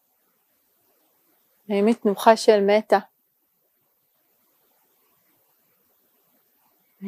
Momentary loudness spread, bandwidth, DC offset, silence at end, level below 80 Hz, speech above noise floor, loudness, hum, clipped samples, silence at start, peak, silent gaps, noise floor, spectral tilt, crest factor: 6 LU; 15.5 kHz; under 0.1%; 0 s; -82 dBFS; 51 dB; -19 LUFS; none; under 0.1%; 1.7 s; -2 dBFS; none; -69 dBFS; -5 dB/octave; 24 dB